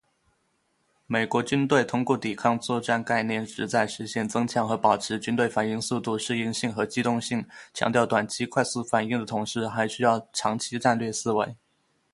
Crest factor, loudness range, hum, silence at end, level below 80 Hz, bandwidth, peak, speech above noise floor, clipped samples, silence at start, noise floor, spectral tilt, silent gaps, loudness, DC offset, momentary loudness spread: 22 dB; 1 LU; none; 0.6 s; -64 dBFS; 11.5 kHz; -6 dBFS; 45 dB; under 0.1%; 1.1 s; -71 dBFS; -4.5 dB/octave; none; -26 LUFS; under 0.1%; 6 LU